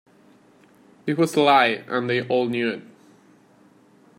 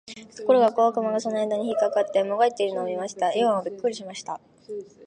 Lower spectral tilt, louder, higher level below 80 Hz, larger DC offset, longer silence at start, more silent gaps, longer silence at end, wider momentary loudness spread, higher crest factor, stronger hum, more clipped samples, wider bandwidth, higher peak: about the same, -5 dB/octave vs -4.5 dB/octave; first, -21 LUFS vs -24 LUFS; about the same, -72 dBFS vs -74 dBFS; neither; first, 1.05 s vs 0.1 s; neither; first, 1.35 s vs 0 s; second, 11 LU vs 17 LU; about the same, 22 dB vs 18 dB; neither; neither; first, 16 kHz vs 10 kHz; first, -2 dBFS vs -6 dBFS